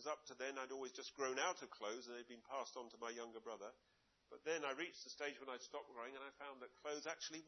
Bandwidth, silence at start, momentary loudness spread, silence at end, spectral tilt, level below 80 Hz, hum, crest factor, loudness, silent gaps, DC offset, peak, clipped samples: 6.2 kHz; 0 s; 11 LU; 0 s; 0 dB/octave; under -90 dBFS; none; 22 dB; -49 LUFS; none; under 0.1%; -28 dBFS; under 0.1%